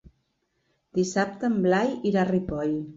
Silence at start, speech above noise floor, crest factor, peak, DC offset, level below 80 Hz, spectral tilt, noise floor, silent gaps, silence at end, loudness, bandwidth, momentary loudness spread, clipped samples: 0.95 s; 49 dB; 16 dB; -10 dBFS; under 0.1%; -54 dBFS; -6 dB/octave; -74 dBFS; none; 0 s; -25 LUFS; 8 kHz; 6 LU; under 0.1%